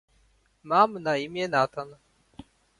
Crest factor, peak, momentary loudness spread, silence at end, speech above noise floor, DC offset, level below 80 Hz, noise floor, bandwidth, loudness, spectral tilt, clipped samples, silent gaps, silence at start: 22 dB; -6 dBFS; 13 LU; 0.85 s; 39 dB; under 0.1%; -64 dBFS; -65 dBFS; 11.5 kHz; -25 LUFS; -5 dB/octave; under 0.1%; none; 0.65 s